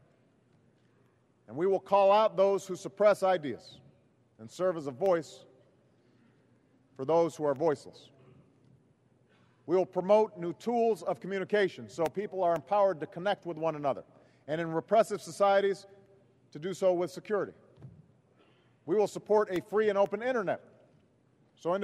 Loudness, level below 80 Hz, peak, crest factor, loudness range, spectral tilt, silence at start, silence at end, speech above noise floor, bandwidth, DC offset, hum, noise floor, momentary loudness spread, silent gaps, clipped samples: -30 LUFS; -78 dBFS; -12 dBFS; 20 dB; 6 LU; -5.5 dB/octave; 1.5 s; 0 s; 38 dB; 13 kHz; under 0.1%; none; -67 dBFS; 14 LU; none; under 0.1%